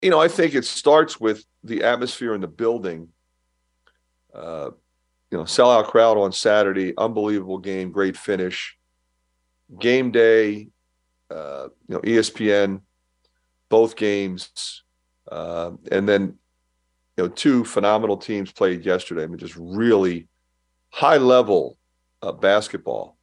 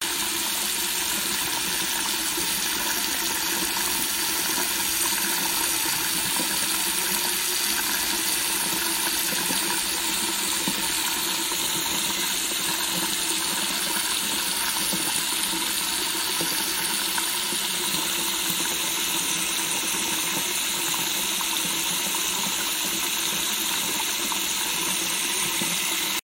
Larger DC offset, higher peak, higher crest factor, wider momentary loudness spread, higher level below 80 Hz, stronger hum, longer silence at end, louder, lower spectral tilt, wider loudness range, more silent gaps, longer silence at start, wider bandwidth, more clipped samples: neither; first, -2 dBFS vs -6 dBFS; about the same, 20 dB vs 20 dB; first, 17 LU vs 1 LU; second, -64 dBFS vs -56 dBFS; neither; about the same, 0.15 s vs 0.1 s; first, -20 LUFS vs -23 LUFS; first, -4.5 dB/octave vs 0 dB/octave; first, 6 LU vs 1 LU; neither; about the same, 0 s vs 0 s; second, 11.5 kHz vs 16 kHz; neither